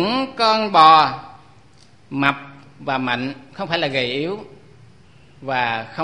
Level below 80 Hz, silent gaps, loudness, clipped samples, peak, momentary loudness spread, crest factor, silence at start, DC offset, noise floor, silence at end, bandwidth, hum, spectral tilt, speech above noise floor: -58 dBFS; none; -18 LUFS; under 0.1%; 0 dBFS; 21 LU; 20 dB; 0 s; 0.3%; -51 dBFS; 0 s; 11 kHz; none; -5 dB/octave; 33 dB